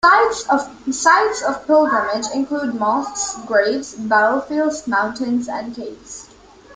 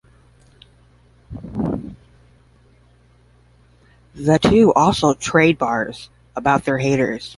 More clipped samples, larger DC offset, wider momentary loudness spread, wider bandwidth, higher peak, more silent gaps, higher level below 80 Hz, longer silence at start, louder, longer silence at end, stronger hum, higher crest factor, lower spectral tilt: neither; neither; second, 13 LU vs 20 LU; second, 9.6 kHz vs 11.5 kHz; about the same, 0 dBFS vs 0 dBFS; neither; second, -56 dBFS vs -44 dBFS; second, 0.05 s vs 1.3 s; about the same, -18 LUFS vs -17 LUFS; about the same, 0 s vs 0.05 s; neither; about the same, 18 dB vs 20 dB; second, -2.5 dB/octave vs -5.5 dB/octave